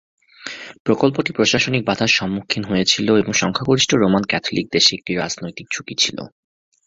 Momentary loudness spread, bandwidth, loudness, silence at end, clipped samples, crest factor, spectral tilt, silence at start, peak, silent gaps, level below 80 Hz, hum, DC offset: 13 LU; 8 kHz; -18 LUFS; 0.6 s; under 0.1%; 18 dB; -3.5 dB/octave; 0.4 s; 0 dBFS; 0.80-0.85 s; -50 dBFS; none; under 0.1%